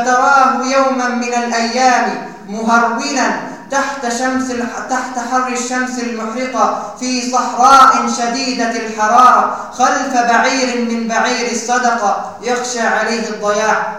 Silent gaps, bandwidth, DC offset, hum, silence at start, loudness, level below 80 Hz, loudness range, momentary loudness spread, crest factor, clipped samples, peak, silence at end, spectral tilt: none; 16 kHz; 0.5%; none; 0 s; -14 LUFS; -54 dBFS; 6 LU; 11 LU; 14 dB; 0.3%; 0 dBFS; 0 s; -2.5 dB/octave